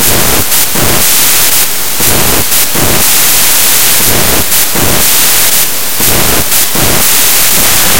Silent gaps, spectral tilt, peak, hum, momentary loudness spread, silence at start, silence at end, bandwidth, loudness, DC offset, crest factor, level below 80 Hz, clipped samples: none; -1 dB/octave; 0 dBFS; none; 3 LU; 0 s; 0 s; over 20 kHz; -5 LUFS; 30%; 10 dB; -26 dBFS; 5%